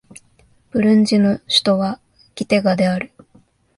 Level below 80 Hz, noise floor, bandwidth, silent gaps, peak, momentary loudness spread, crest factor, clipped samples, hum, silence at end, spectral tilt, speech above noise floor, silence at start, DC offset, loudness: -56 dBFS; -55 dBFS; 11.5 kHz; none; -2 dBFS; 14 LU; 16 dB; under 0.1%; none; 0.7 s; -5.5 dB/octave; 39 dB; 0.75 s; under 0.1%; -17 LUFS